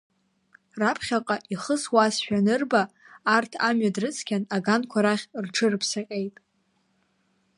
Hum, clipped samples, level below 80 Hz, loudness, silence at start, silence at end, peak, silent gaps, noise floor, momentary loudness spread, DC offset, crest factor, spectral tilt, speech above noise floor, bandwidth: none; under 0.1%; -70 dBFS; -25 LUFS; 0.75 s; 1.3 s; -6 dBFS; none; -70 dBFS; 8 LU; under 0.1%; 20 dB; -4 dB/octave; 45 dB; 11.5 kHz